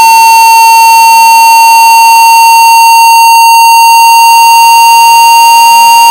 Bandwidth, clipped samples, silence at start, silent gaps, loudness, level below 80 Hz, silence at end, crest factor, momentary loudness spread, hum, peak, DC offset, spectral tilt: over 20 kHz; 8%; 0 s; none; 0 LUFS; -48 dBFS; 0 s; 0 dB; 0 LU; none; 0 dBFS; under 0.1%; 3 dB/octave